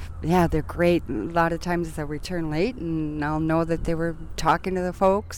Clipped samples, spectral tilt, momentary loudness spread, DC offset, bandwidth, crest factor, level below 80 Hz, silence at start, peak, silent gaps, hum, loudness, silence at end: under 0.1%; -6.5 dB/octave; 7 LU; under 0.1%; 17.5 kHz; 16 dB; -38 dBFS; 0 s; -8 dBFS; none; none; -25 LUFS; 0 s